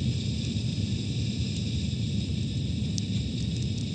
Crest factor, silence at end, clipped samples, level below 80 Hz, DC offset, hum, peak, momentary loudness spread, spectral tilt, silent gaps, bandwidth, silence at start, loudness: 20 dB; 0 s; under 0.1%; -40 dBFS; under 0.1%; none; -8 dBFS; 1 LU; -5.5 dB/octave; none; 9.2 kHz; 0 s; -30 LUFS